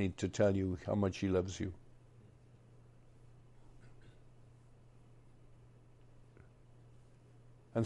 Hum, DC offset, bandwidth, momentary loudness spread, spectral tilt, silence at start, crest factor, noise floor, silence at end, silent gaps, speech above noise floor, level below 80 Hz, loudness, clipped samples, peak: none; under 0.1%; 10 kHz; 28 LU; -7 dB/octave; 0 s; 20 dB; -61 dBFS; 0 s; none; 26 dB; -66 dBFS; -36 LUFS; under 0.1%; -20 dBFS